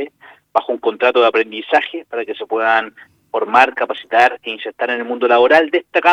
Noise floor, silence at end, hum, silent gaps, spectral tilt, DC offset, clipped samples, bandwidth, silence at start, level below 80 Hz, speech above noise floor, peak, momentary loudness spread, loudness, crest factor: -43 dBFS; 0 s; none; none; -3.5 dB/octave; under 0.1%; under 0.1%; 10 kHz; 0 s; -64 dBFS; 27 dB; 0 dBFS; 12 LU; -16 LUFS; 16 dB